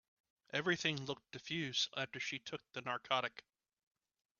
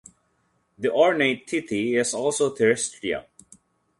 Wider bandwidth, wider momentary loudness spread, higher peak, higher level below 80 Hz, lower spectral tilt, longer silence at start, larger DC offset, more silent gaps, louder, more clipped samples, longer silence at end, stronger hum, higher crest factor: second, 7.2 kHz vs 11.5 kHz; about the same, 10 LU vs 10 LU; second, -18 dBFS vs -6 dBFS; second, -80 dBFS vs -64 dBFS; second, -1.5 dB/octave vs -3.5 dB/octave; second, 0.55 s vs 0.8 s; neither; neither; second, -40 LUFS vs -23 LUFS; neither; first, 1 s vs 0.8 s; neither; about the same, 24 dB vs 20 dB